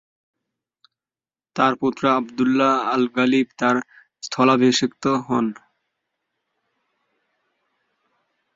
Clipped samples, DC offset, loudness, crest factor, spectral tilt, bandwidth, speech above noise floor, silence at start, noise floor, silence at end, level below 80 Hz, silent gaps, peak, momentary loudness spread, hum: under 0.1%; under 0.1%; -20 LUFS; 20 dB; -4.5 dB/octave; 7.8 kHz; over 71 dB; 1.55 s; under -90 dBFS; 3 s; -66 dBFS; none; -2 dBFS; 8 LU; none